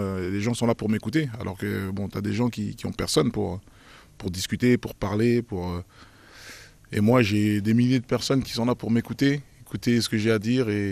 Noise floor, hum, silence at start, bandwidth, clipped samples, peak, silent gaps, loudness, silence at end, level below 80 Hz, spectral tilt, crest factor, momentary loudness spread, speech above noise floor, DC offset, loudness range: -46 dBFS; none; 0 s; 15.5 kHz; under 0.1%; -6 dBFS; none; -25 LUFS; 0 s; -52 dBFS; -6 dB/octave; 18 dB; 12 LU; 22 dB; under 0.1%; 4 LU